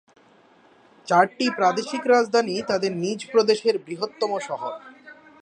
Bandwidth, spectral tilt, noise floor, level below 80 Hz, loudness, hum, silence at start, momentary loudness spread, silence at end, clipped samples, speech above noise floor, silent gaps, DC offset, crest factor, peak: 9.8 kHz; -4 dB/octave; -55 dBFS; -72 dBFS; -22 LUFS; none; 1.05 s; 12 LU; 0.3 s; under 0.1%; 33 dB; none; under 0.1%; 20 dB; -4 dBFS